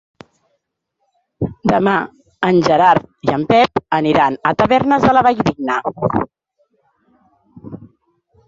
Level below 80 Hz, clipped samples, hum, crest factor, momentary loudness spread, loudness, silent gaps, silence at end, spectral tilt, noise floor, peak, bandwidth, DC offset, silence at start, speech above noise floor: -46 dBFS; under 0.1%; none; 16 dB; 14 LU; -15 LUFS; none; 0.6 s; -6.5 dB/octave; -71 dBFS; -2 dBFS; 7.8 kHz; under 0.1%; 1.4 s; 57 dB